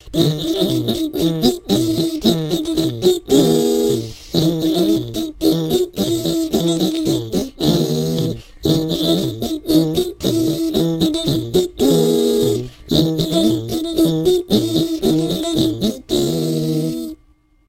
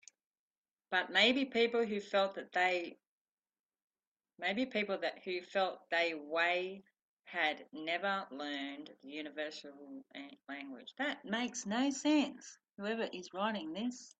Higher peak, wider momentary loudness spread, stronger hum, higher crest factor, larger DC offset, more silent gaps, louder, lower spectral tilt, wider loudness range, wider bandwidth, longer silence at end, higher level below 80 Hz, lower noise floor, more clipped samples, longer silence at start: first, 0 dBFS vs -14 dBFS; second, 5 LU vs 16 LU; neither; about the same, 18 dB vs 22 dB; neither; second, none vs 3.07-3.25 s, 3.32-3.37 s, 3.60-3.69 s, 3.82-3.90 s, 4.07-4.16 s, 7.02-7.17 s; first, -18 LUFS vs -36 LUFS; first, -6 dB/octave vs -3 dB/octave; second, 2 LU vs 8 LU; first, 16.5 kHz vs 9 kHz; first, 0.55 s vs 0.1 s; first, -40 dBFS vs -84 dBFS; second, -54 dBFS vs under -90 dBFS; neither; second, 0.05 s vs 0.9 s